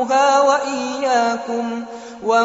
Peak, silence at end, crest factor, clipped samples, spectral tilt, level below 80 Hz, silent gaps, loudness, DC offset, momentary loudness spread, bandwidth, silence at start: -4 dBFS; 0 s; 14 dB; under 0.1%; -1 dB/octave; -64 dBFS; none; -18 LUFS; under 0.1%; 13 LU; 8 kHz; 0 s